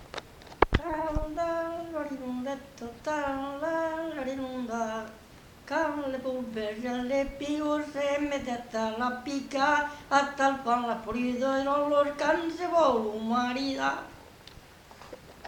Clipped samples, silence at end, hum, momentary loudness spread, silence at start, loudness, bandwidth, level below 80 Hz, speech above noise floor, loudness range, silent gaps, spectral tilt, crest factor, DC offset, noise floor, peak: under 0.1%; 0 s; none; 15 LU; 0 s; -30 LUFS; 19 kHz; -46 dBFS; 22 dB; 6 LU; none; -5 dB/octave; 28 dB; under 0.1%; -51 dBFS; -4 dBFS